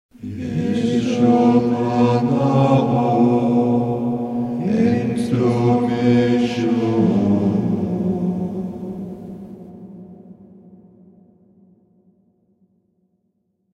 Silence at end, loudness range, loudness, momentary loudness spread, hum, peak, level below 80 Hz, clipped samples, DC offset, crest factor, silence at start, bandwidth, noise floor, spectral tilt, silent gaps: 3.4 s; 13 LU; -18 LUFS; 17 LU; none; -4 dBFS; -54 dBFS; under 0.1%; under 0.1%; 16 dB; 0.2 s; 10.5 kHz; -69 dBFS; -8.5 dB/octave; none